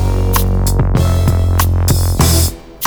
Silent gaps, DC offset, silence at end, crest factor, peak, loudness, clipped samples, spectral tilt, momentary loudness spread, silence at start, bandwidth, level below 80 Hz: none; under 0.1%; 0 s; 12 dB; 0 dBFS; -13 LUFS; under 0.1%; -5 dB/octave; 3 LU; 0 s; over 20 kHz; -18 dBFS